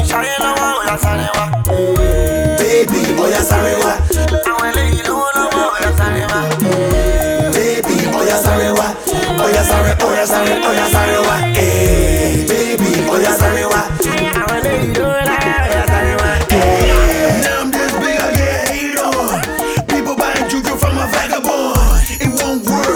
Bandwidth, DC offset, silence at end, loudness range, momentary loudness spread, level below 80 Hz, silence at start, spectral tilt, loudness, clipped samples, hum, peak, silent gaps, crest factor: 19.5 kHz; under 0.1%; 0 s; 2 LU; 4 LU; -20 dBFS; 0 s; -4.5 dB/octave; -14 LUFS; under 0.1%; none; 0 dBFS; none; 14 dB